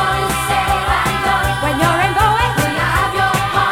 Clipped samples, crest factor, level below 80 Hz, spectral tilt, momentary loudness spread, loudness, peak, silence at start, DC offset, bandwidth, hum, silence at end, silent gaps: under 0.1%; 14 dB; -28 dBFS; -4 dB/octave; 3 LU; -15 LUFS; -2 dBFS; 0 s; under 0.1%; 17 kHz; none; 0 s; none